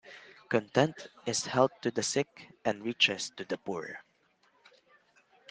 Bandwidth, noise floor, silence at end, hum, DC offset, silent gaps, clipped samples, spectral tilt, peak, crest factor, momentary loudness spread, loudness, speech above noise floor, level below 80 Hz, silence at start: 10 kHz; -70 dBFS; 1.5 s; none; under 0.1%; none; under 0.1%; -3.5 dB/octave; -8 dBFS; 24 dB; 14 LU; -31 LUFS; 38 dB; -74 dBFS; 0.05 s